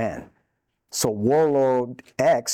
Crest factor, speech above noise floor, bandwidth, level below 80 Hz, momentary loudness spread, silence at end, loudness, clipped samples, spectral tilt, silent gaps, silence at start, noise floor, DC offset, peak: 16 dB; 52 dB; 18.5 kHz; -60 dBFS; 13 LU; 0 s; -22 LUFS; under 0.1%; -4.5 dB/octave; none; 0 s; -73 dBFS; under 0.1%; -8 dBFS